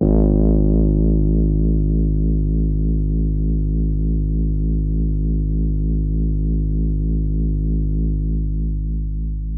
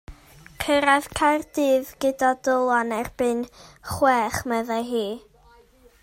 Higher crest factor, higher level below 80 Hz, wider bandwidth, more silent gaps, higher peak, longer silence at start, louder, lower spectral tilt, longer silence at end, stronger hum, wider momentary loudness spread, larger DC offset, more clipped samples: second, 14 dB vs 20 dB; first, -18 dBFS vs -50 dBFS; second, 1.1 kHz vs 16 kHz; neither; about the same, -4 dBFS vs -4 dBFS; about the same, 0 s vs 0.1 s; first, -20 LUFS vs -23 LUFS; first, -17.5 dB/octave vs -4 dB/octave; second, 0 s vs 0.85 s; neither; second, 6 LU vs 12 LU; neither; neither